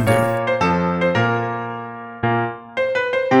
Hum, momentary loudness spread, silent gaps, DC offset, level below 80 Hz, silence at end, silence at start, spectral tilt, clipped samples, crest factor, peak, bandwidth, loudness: none; 9 LU; none; under 0.1%; -50 dBFS; 0 s; 0 s; -6.5 dB/octave; under 0.1%; 16 dB; -2 dBFS; 16.5 kHz; -20 LUFS